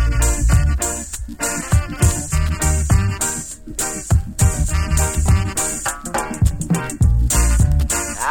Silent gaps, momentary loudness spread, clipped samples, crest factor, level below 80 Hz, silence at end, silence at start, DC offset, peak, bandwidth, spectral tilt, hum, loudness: none; 7 LU; under 0.1%; 14 dB; -20 dBFS; 0 s; 0 s; under 0.1%; -2 dBFS; 17.5 kHz; -4.5 dB/octave; none; -19 LUFS